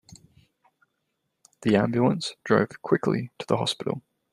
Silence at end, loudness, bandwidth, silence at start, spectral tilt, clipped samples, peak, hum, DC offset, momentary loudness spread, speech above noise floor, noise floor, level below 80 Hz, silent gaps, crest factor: 0.35 s; -25 LUFS; 12.5 kHz; 0.1 s; -6 dB/octave; under 0.1%; -6 dBFS; none; under 0.1%; 8 LU; 54 dB; -78 dBFS; -64 dBFS; none; 22 dB